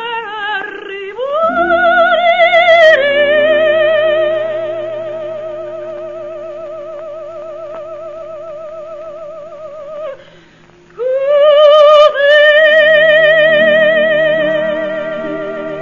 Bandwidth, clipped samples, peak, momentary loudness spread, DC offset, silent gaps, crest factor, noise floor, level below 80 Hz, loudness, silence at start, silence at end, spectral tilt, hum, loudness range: 7.2 kHz; 0.2%; 0 dBFS; 21 LU; 0.5%; none; 12 dB; -43 dBFS; -54 dBFS; -10 LUFS; 0 s; 0 s; -4 dB/octave; none; 20 LU